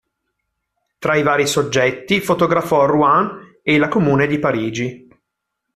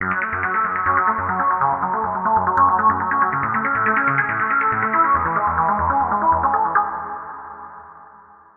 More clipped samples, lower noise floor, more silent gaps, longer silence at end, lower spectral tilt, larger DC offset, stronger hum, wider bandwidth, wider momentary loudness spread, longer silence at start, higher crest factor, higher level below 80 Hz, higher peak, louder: neither; first, -77 dBFS vs -46 dBFS; neither; first, 0.8 s vs 0.5 s; second, -5 dB/octave vs -9.5 dB/octave; neither; neither; first, 15 kHz vs 3.4 kHz; about the same, 11 LU vs 10 LU; first, 1 s vs 0 s; about the same, 16 dB vs 16 dB; second, -52 dBFS vs -46 dBFS; about the same, -2 dBFS vs -4 dBFS; about the same, -17 LUFS vs -18 LUFS